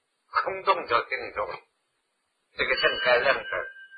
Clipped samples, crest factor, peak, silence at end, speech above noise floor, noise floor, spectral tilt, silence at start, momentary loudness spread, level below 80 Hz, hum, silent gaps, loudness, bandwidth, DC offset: under 0.1%; 20 dB; -8 dBFS; 0 s; 50 dB; -76 dBFS; -5 dB/octave; 0.35 s; 12 LU; -60 dBFS; none; none; -26 LUFS; 5 kHz; under 0.1%